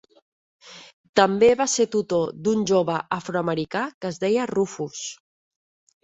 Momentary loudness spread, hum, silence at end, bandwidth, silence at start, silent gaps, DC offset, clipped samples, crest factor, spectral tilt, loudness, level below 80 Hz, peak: 13 LU; none; 0.9 s; 8.4 kHz; 0.65 s; 0.93-1.13 s, 3.94-4.01 s; under 0.1%; under 0.1%; 22 dB; -4.5 dB/octave; -23 LUFS; -62 dBFS; -2 dBFS